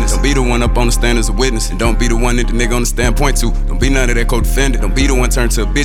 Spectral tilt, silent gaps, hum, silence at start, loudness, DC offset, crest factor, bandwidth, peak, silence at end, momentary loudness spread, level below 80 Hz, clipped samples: -4.5 dB/octave; none; none; 0 s; -15 LUFS; under 0.1%; 12 dB; 15.5 kHz; 0 dBFS; 0 s; 2 LU; -14 dBFS; under 0.1%